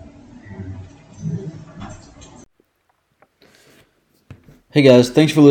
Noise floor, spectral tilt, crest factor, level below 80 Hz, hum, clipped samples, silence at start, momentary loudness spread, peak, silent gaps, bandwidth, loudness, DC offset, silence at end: -66 dBFS; -6.5 dB/octave; 18 dB; -52 dBFS; none; under 0.1%; 0.5 s; 26 LU; 0 dBFS; none; 16.5 kHz; -14 LUFS; under 0.1%; 0 s